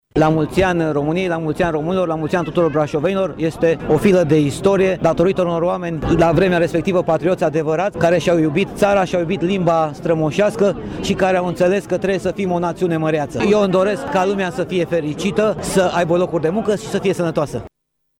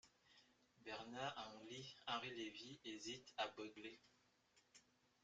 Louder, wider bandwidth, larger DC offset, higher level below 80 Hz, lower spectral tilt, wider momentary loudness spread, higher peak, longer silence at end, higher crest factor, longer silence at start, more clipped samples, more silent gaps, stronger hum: first, -17 LUFS vs -51 LUFS; first, 16.5 kHz vs 9 kHz; neither; first, -42 dBFS vs -88 dBFS; first, -6.5 dB/octave vs -3 dB/octave; second, 5 LU vs 9 LU; first, -4 dBFS vs -30 dBFS; about the same, 0.5 s vs 0.4 s; second, 14 dB vs 24 dB; about the same, 0.15 s vs 0.05 s; neither; neither; neither